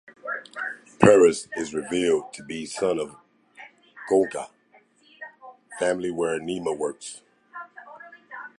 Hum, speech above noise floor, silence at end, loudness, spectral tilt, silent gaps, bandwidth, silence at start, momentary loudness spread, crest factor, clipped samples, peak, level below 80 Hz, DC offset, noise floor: none; 36 dB; 0.1 s; -24 LUFS; -5 dB/octave; none; 11.5 kHz; 0.25 s; 24 LU; 26 dB; under 0.1%; 0 dBFS; -60 dBFS; under 0.1%; -59 dBFS